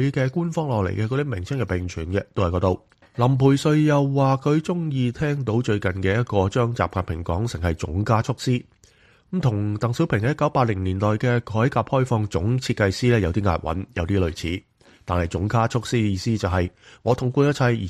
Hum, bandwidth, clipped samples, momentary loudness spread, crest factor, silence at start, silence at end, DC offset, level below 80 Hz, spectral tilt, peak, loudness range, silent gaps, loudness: none; 12.5 kHz; under 0.1%; 8 LU; 18 dB; 0 s; 0 s; under 0.1%; -42 dBFS; -7 dB/octave; -4 dBFS; 3 LU; none; -23 LUFS